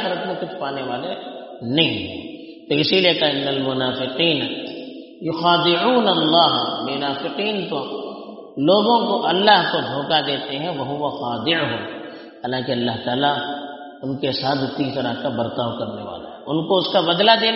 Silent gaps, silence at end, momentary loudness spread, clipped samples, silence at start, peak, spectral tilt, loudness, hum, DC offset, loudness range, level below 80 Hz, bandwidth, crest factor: none; 0 s; 16 LU; under 0.1%; 0 s; 0 dBFS; -2.5 dB/octave; -20 LUFS; none; under 0.1%; 5 LU; -62 dBFS; 6 kHz; 20 dB